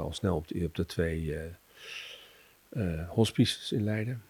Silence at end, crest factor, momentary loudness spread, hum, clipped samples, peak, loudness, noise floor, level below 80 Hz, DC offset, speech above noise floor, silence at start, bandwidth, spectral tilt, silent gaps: 0.1 s; 22 dB; 16 LU; none; under 0.1%; -12 dBFS; -32 LUFS; -58 dBFS; -52 dBFS; under 0.1%; 27 dB; 0 s; 19 kHz; -6 dB/octave; none